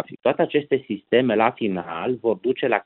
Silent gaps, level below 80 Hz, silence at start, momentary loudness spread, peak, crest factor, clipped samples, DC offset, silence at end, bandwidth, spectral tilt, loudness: none; -66 dBFS; 0 s; 7 LU; -4 dBFS; 18 dB; under 0.1%; under 0.1%; 0.05 s; 4.2 kHz; -10.5 dB/octave; -22 LUFS